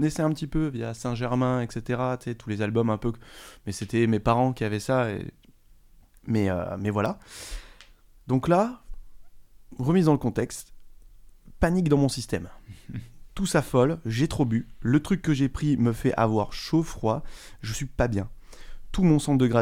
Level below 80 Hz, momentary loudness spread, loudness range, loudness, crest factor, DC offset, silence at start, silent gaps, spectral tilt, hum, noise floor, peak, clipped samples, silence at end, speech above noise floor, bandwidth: -42 dBFS; 17 LU; 4 LU; -26 LUFS; 20 dB; under 0.1%; 0 s; none; -6.5 dB/octave; none; -54 dBFS; -6 dBFS; under 0.1%; 0 s; 29 dB; 16 kHz